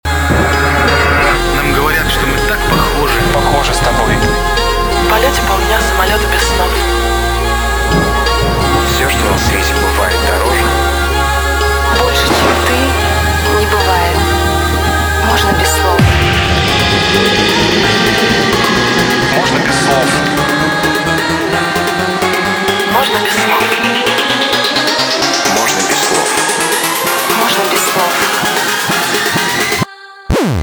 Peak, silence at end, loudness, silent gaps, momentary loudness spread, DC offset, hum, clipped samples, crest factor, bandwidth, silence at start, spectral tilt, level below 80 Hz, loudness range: 0 dBFS; 0 s; -11 LUFS; none; 3 LU; under 0.1%; none; under 0.1%; 12 dB; over 20 kHz; 0.05 s; -3.5 dB/octave; -20 dBFS; 2 LU